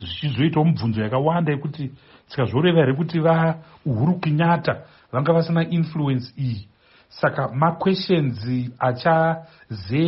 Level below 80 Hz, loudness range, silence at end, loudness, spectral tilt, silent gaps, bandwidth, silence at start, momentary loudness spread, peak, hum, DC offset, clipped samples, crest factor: -56 dBFS; 2 LU; 0 s; -21 LUFS; -6 dB/octave; none; 5.8 kHz; 0 s; 11 LU; -4 dBFS; none; under 0.1%; under 0.1%; 16 dB